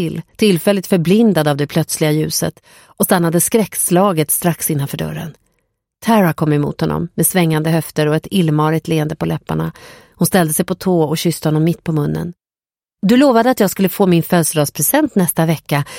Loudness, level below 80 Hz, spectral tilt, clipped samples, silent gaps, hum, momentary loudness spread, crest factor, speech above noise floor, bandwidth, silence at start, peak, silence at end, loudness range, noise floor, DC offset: -15 LUFS; -48 dBFS; -5 dB/octave; under 0.1%; none; none; 8 LU; 14 dB; over 75 dB; 17 kHz; 0 s; 0 dBFS; 0 s; 3 LU; under -90 dBFS; under 0.1%